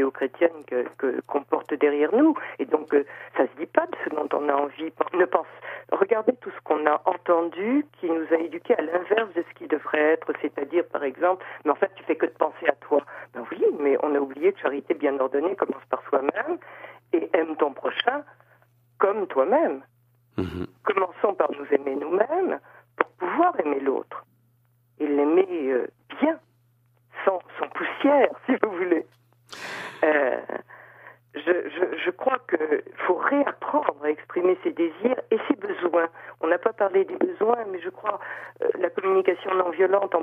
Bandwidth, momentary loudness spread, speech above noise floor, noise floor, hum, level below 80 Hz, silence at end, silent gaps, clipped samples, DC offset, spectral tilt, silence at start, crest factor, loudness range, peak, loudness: 7.8 kHz; 9 LU; 40 dB; -64 dBFS; none; -68 dBFS; 0 s; none; under 0.1%; under 0.1%; -6.5 dB/octave; 0 s; 22 dB; 2 LU; -2 dBFS; -25 LUFS